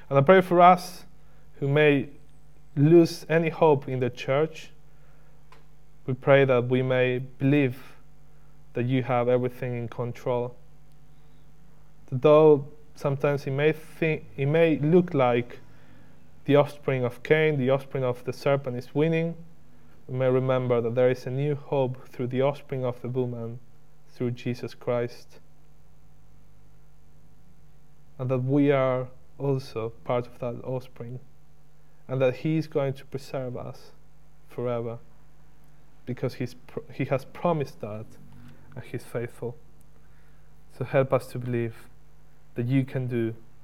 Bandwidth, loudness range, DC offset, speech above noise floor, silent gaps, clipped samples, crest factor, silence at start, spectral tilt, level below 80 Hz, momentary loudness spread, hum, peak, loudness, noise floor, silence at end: 15.5 kHz; 11 LU; 0.8%; 34 dB; none; under 0.1%; 24 dB; 0.1 s; -8 dB/octave; -60 dBFS; 18 LU; none; -2 dBFS; -25 LUFS; -59 dBFS; 0.3 s